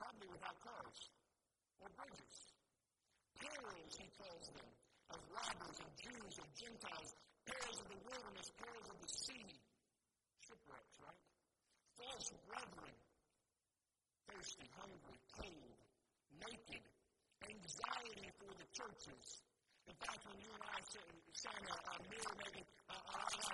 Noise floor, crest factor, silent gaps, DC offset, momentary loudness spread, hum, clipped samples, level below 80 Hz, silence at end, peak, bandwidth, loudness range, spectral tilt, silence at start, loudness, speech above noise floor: under -90 dBFS; 28 dB; none; under 0.1%; 14 LU; none; under 0.1%; -78 dBFS; 0 s; -28 dBFS; 11.5 kHz; 7 LU; -1.5 dB/octave; 0 s; -53 LUFS; over 36 dB